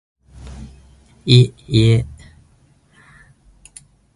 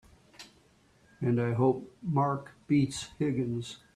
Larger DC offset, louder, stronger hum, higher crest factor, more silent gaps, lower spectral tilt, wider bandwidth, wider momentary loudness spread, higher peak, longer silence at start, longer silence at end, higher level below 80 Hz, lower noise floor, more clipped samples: neither; first, -15 LUFS vs -30 LUFS; neither; about the same, 20 dB vs 18 dB; neither; about the same, -6.5 dB/octave vs -7 dB/octave; about the same, 11.5 kHz vs 12.5 kHz; first, 25 LU vs 11 LU; first, 0 dBFS vs -14 dBFS; about the same, 0.45 s vs 0.4 s; first, 2.05 s vs 0.2 s; first, -40 dBFS vs -64 dBFS; second, -54 dBFS vs -64 dBFS; neither